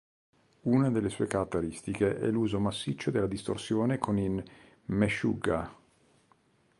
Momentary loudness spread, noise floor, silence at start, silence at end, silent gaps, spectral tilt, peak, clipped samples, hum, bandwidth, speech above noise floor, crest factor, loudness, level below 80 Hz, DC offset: 8 LU; -67 dBFS; 0.65 s; 1.05 s; none; -6.5 dB/octave; -12 dBFS; under 0.1%; none; 11.5 kHz; 37 dB; 18 dB; -31 LUFS; -54 dBFS; under 0.1%